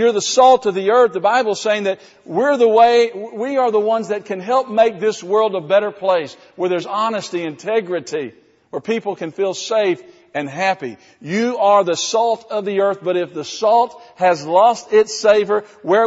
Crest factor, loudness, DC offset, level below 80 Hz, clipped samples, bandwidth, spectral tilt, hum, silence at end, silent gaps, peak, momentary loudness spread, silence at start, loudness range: 16 dB; -17 LUFS; under 0.1%; -66 dBFS; under 0.1%; 8 kHz; -2.5 dB/octave; none; 0 s; none; 0 dBFS; 12 LU; 0 s; 6 LU